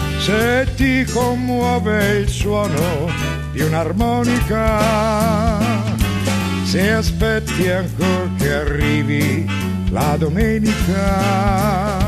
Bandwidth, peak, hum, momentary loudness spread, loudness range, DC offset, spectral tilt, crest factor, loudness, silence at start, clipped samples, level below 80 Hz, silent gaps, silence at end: 14 kHz; -4 dBFS; none; 3 LU; 1 LU; under 0.1%; -5.5 dB/octave; 14 dB; -17 LUFS; 0 s; under 0.1%; -26 dBFS; none; 0 s